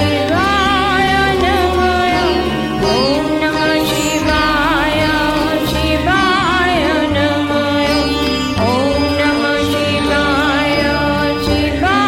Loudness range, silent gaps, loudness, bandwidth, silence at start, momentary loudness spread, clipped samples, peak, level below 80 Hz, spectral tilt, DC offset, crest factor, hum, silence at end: 1 LU; none; -14 LUFS; 17 kHz; 0 s; 3 LU; under 0.1%; 0 dBFS; -28 dBFS; -4.5 dB/octave; under 0.1%; 14 dB; none; 0 s